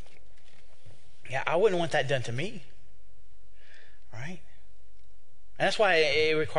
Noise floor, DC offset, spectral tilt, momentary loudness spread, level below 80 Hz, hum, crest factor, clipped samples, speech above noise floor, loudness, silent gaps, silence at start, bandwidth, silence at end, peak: -61 dBFS; 3%; -4.5 dB/octave; 20 LU; -60 dBFS; none; 20 dB; under 0.1%; 34 dB; -27 LUFS; none; 0.85 s; 10.5 kHz; 0 s; -10 dBFS